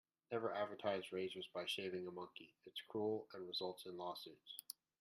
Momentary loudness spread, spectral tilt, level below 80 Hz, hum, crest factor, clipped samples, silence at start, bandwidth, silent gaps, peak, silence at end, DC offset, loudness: 10 LU; -4 dB/octave; under -90 dBFS; none; 20 dB; under 0.1%; 0.3 s; 14.5 kHz; none; -28 dBFS; 0.3 s; under 0.1%; -47 LUFS